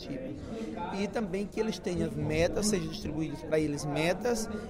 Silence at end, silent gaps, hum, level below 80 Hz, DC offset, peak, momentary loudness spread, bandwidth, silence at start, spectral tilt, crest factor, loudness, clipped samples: 0 s; none; none; -48 dBFS; under 0.1%; -16 dBFS; 9 LU; 16 kHz; 0 s; -5 dB/octave; 16 dB; -32 LUFS; under 0.1%